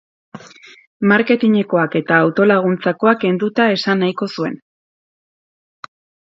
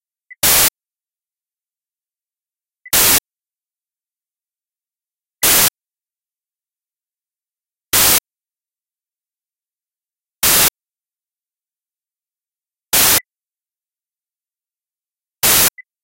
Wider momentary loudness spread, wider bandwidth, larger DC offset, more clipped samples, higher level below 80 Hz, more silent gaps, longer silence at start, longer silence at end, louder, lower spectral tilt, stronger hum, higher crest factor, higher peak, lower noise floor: first, 9 LU vs 6 LU; second, 7.6 kHz vs 16.5 kHz; neither; neither; second, -66 dBFS vs -46 dBFS; first, 0.87-1.00 s vs none; about the same, 0.35 s vs 0.45 s; first, 1.75 s vs 0.25 s; second, -16 LUFS vs -12 LUFS; first, -7 dB/octave vs 0 dB/octave; neither; about the same, 18 dB vs 20 dB; about the same, 0 dBFS vs 0 dBFS; second, -42 dBFS vs under -90 dBFS